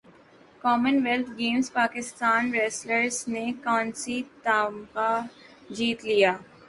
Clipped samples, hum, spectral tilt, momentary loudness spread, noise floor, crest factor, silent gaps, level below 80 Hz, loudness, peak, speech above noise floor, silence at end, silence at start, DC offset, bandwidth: under 0.1%; none; -3 dB/octave; 8 LU; -54 dBFS; 20 dB; none; -68 dBFS; -26 LUFS; -8 dBFS; 28 dB; 0.25 s; 0.65 s; under 0.1%; 11.5 kHz